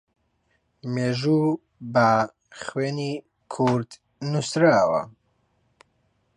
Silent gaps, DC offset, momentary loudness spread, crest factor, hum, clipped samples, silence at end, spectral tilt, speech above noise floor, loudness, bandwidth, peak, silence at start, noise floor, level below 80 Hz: none; under 0.1%; 17 LU; 18 dB; none; under 0.1%; 1.25 s; -6 dB/octave; 47 dB; -23 LUFS; 11 kHz; -6 dBFS; 0.85 s; -70 dBFS; -64 dBFS